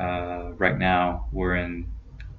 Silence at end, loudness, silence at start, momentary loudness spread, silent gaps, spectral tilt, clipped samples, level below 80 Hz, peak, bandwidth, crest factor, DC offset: 0 s; -25 LUFS; 0 s; 14 LU; none; -8.5 dB/octave; under 0.1%; -36 dBFS; -6 dBFS; 6 kHz; 22 dB; under 0.1%